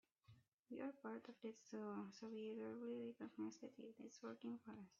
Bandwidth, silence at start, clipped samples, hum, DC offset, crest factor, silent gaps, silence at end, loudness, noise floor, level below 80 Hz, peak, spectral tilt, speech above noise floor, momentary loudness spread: 7.2 kHz; 0.3 s; under 0.1%; none; under 0.1%; 14 dB; 0.53-0.63 s; 0.05 s; -54 LUFS; -73 dBFS; under -90 dBFS; -40 dBFS; -5.5 dB/octave; 20 dB; 7 LU